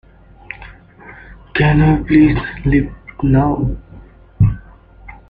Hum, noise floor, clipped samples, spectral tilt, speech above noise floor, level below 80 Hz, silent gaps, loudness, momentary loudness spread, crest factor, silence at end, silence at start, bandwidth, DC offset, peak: none; -40 dBFS; under 0.1%; -11 dB/octave; 28 dB; -28 dBFS; none; -15 LUFS; 21 LU; 14 dB; 0.15 s; 0.5 s; 4.9 kHz; under 0.1%; -2 dBFS